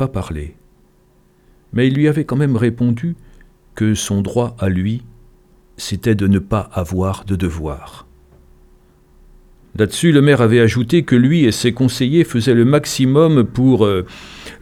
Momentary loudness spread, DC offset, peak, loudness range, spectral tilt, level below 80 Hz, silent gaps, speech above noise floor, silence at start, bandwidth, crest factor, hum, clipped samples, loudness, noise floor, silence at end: 15 LU; under 0.1%; -2 dBFS; 8 LU; -6.5 dB/octave; -40 dBFS; none; 38 dB; 0 s; 14.5 kHz; 16 dB; none; under 0.1%; -15 LUFS; -53 dBFS; 0.05 s